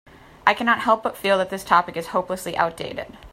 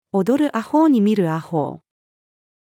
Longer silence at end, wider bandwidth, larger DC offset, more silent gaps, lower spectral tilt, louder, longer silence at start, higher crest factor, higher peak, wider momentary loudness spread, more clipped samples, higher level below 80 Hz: second, 0.05 s vs 0.85 s; about the same, 16 kHz vs 16 kHz; neither; neither; second, -4 dB/octave vs -8 dB/octave; second, -22 LUFS vs -19 LUFS; first, 0.45 s vs 0.15 s; first, 22 dB vs 14 dB; first, 0 dBFS vs -6 dBFS; about the same, 9 LU vs 9 LU; neither; first, -54 dBFS vs -70 dBFS